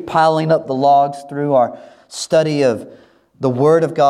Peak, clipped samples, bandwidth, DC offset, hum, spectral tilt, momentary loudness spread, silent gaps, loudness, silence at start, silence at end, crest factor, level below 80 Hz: -2 dBFS; under 0.1%; 12.5 kHz; under 0.1%; none; -6 dB/octave; 9 LU; none; -15 LUFS; 0 s; 0 s; 14 dB; -60 dBFS